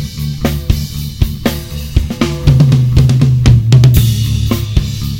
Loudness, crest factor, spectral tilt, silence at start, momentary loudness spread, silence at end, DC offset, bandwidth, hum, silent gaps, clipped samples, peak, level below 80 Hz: -12 LUFS; 10 dB; -6.5 dB/octave; 0 s; 10 LU; 0 s; 0.5%; 17 kHz; none; none; 2%; 0 dBFS; -20 dBFS